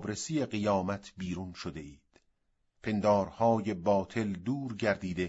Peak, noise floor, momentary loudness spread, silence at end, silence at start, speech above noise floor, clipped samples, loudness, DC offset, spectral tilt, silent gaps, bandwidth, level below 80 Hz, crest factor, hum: -14 dBFS; -75 dBFS; 13 LU; 0 s; 0 s; 44 dB; under 0.1%; -32 LUFS; under 0.1%; -6 dB/octave; none; 8 kHz; -60 dBFS; 18 dB; none